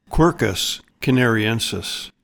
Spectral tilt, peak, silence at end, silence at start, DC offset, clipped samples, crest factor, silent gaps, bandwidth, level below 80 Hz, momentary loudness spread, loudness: -4.5 dB/octave; -4 dBFS; 0.15 s; 0.1 s; under 0.1%; under 0.1%; 16 dB; none; 19 kHz; -34 dBFS; 8 LU; -20 LUFS